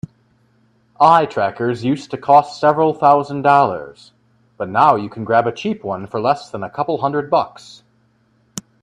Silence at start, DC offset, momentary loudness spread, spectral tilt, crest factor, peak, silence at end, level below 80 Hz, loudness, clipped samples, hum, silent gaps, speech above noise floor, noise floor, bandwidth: 1 s; under 0.1%; 16 LU; -6 dB/octave; 18 dB; 0 dBFS; 0.2 s; -60 dBFS; -16 LUFS; under 0.1%; none; none; 42 dB; -59 dBFS; 13 kHz